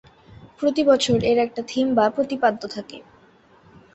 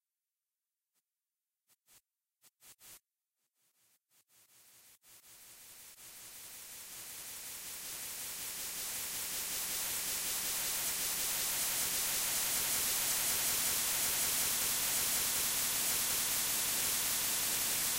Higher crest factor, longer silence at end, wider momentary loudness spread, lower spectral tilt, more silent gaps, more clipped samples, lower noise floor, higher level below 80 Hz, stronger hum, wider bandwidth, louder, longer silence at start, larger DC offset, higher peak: about the same, 18 dB vs 18 dB; first, 0.95 s vs 0 s; about the same, 14 LU vs 16 LU; first, -5 dB/octave vs 1 dB/octave; neither; neither; second, -54 dBFS vs under -90 dBFS; first, -54 dBFS vs -64 dBFS; neither; second, 8.4 kHz vs 16 kHz; first, -21 LUFS vs -32 LUFS; second, 0.45 s vs 2.65 s; neither; first, -4 dBFS vs -20 dBFS